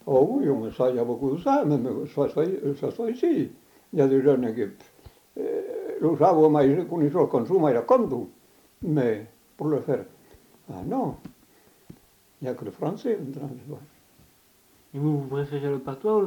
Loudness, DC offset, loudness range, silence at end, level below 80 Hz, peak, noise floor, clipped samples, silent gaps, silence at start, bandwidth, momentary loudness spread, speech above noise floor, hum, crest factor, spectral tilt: -25 LUFS; under 0.1%; 12 LU; 0 s; -62 dBFS; -6 dBFS; -60 dBFS; under 0.1%; none; 0.05 s; 19 kHz; 15 LU; 36 dB; none; 20 dB; -9 dB/octave